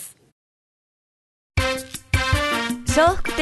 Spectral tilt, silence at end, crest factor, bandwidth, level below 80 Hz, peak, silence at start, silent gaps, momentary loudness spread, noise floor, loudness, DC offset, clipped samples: -4 dB/octave; 0 s; 20 dB; 12.5 kHz; -32 dBFS; -2 dBFS; 0 s; 0.32-1.50 s; 10 LU; under -90 dBFS; -21 LUFS; under 0.1%; under 0.1%